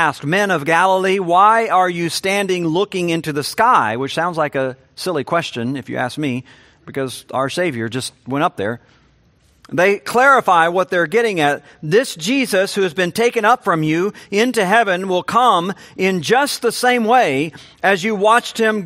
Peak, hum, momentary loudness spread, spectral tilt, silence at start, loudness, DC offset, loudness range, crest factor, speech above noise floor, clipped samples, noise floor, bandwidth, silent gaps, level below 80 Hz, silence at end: 0 dBFS; none; 10 LU; -4.5 dB/octave; 0 s; -16 LUFS; under 0.1%; 7 LU; 16 dB; 38 dB; under 0.1%; -55 dBFS; 16 kHz; none; -62 dBFS; 0 s